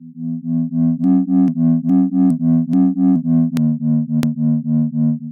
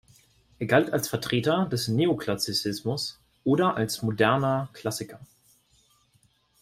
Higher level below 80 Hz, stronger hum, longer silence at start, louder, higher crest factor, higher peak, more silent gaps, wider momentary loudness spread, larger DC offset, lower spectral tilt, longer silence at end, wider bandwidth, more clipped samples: first, -54 dBFS vs -62 dBFS; neither; second, 0 s vs 0.6 s; first, -16 LUFS vs -26 LUFS; second, 14 dB vs 22 dB; first, 0 dBFS vs -6 dBFS; neither; second, 5 LU vs 10 LU; neither; first, -10 dB/octave vs -5 dB/octave; second, 0 s vs 1.4 s; second, 7.2 kHz vs 16 kHz; neither